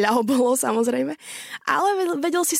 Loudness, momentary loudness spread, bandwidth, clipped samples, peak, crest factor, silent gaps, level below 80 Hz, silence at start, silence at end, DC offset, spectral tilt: -22 LUFS; 10 LU; 16.5 kHz; under 0.1%; -6 dBFS; 14 dB; none; -70 dBFS; 0 s; 0 s; under 0.1%; -3 dB/octave